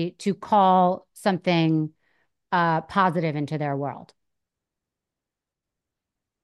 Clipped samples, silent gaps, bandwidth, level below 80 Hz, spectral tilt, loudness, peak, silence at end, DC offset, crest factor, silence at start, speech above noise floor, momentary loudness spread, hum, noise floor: under 0.1%; none; 12.5 kHz; -68 dBFS; -7 dB/octave; -23 LUFS; -8 dBFS; 2.45 s; under 0.1%; 18 dB; 0 s; 65 dB; 11 LU; none; -87 dBFS